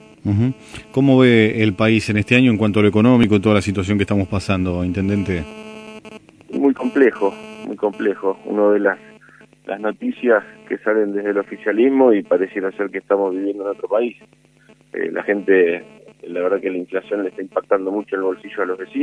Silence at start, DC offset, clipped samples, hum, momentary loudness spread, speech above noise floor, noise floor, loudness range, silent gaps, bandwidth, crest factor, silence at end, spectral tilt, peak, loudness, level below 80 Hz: 0.25 s; under 0.1%; under 0.1%; none; 12 LU; 34 dB; -51 dBFS; 6 LU; none; 10.5 kHz; 18 dB; 0 s; -7.5 dB/octave; 0 dBFS; -18 LUFS; -50 dBFS